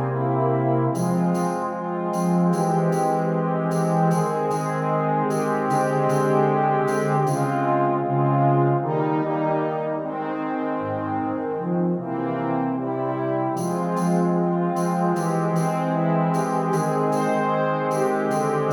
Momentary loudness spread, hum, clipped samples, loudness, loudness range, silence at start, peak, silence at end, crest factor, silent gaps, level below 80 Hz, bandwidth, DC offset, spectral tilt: 5 LU; none; under 0.1%; -22 LUFS; 4 LU; 0 s; -8 dBFS; 0 s; 14 dB; none; -66 dBFS; 17.5 kHz; under 0.1%; -7.5 dB/octave